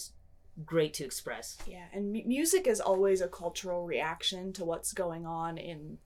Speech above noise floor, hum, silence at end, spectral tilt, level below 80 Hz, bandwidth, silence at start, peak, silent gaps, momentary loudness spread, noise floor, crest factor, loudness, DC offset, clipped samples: 23 dB; none; 0.1 s; -3.5 dB/octave; -58 dBFS; 18 kHz; 0 s; -16 dBFS; none; 15 LU; -55 dBFS; 16 dB; -33 LUFS; under 0.1%; under 0.1%